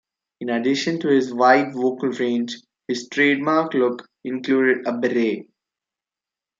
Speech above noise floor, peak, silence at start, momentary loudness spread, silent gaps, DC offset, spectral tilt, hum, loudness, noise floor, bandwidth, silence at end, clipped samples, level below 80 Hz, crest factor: 69 dB; -2 dBFS; 0.4 s; 13 LU; none; under 0.1%; -5 dB/octave; none; -20 LUFS; -89 dBFS; 7.6 kHz; 1.15 s; under 0.1%; -74 dBFS; 20 dB